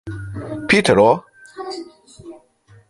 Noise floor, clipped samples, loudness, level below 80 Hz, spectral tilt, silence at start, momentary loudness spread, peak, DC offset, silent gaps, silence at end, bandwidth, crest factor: -51 dBFS; under 0.1%; -16 LUFS; -48 dBFS; -5 dB/octave; 0.05 s; 19 LU; 0 dBFS; under 0.1%; none; 0.55 s; 11.5 kHz; 20 dB